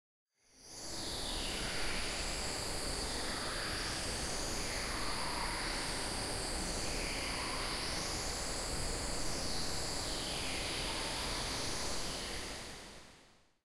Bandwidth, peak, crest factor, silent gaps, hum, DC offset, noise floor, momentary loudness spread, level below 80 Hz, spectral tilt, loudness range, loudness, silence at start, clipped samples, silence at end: 16 kHz; -24 dBFS; 14 dB; none; none; under 0.1%; -65 dBFS; 3 LU; -46 dBFS; -2 dB/octave; 1 LU; -38 LUFS; 0.55 s; under 0.1%; 0.35 s